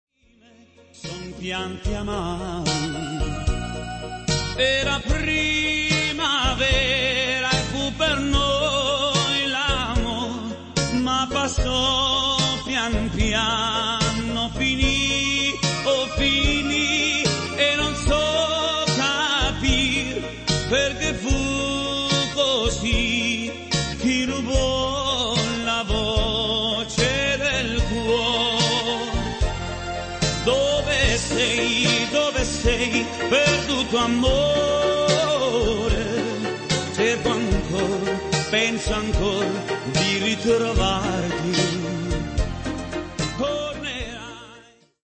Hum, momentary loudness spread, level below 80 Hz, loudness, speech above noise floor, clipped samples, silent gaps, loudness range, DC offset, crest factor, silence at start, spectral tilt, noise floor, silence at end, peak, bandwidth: none; 8 LU; -32 dBFS; -21 LUFS; 31 dB; under 0.1%; none; 4 LU; under 0.1%; 16 dB; 0.95 s; -3.5 dB/octave; -55 dBFS; 0.4 s; -6 dBFS; 8.8 kHz